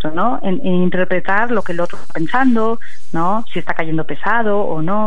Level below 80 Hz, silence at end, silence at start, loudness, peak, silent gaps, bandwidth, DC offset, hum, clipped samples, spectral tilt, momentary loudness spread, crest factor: -50 dBFS; 0 s; 0 s; -18 LUFS; -2 dBFS; none; 10.5 kHz; 20%; none; under 0.1%; -7.5 dB/octave; 7 LU; 16 dB